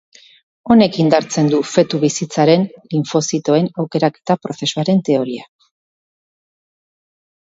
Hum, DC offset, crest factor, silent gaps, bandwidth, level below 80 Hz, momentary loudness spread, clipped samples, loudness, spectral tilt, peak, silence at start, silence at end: none; under 0.1%; 16 dB; none; 8 kHz; -58 dBFS; 8 LU; under 0.1%; -16 LUFS; -5.5 dB/octave; 0 dBFS; 0.65 s; 2.1 s